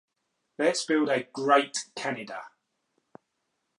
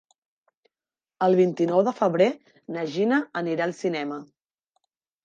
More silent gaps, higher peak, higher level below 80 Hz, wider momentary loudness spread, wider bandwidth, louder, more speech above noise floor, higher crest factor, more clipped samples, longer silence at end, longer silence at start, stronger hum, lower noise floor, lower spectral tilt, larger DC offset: neither; about the same, -6 dBFS vs -8 dBFS; second, -86 dBFS vs -78 dBFS; about the same, 13 LU vs 13 LU; first, 11.5 kHz vs 7.6 kHz; second, -27 LUFS vs -24 LUFS; second, 52 dB vs over 67 dB; about the same, 22 dB vs 18 dB; neither; first, 1.3 s vs 1 s; second, 0.6 s vs 1.2 s; neither; second, -79 dBFS vs under -90 dBFS; second, -3 dB/octave vs -7 dB/octave; neither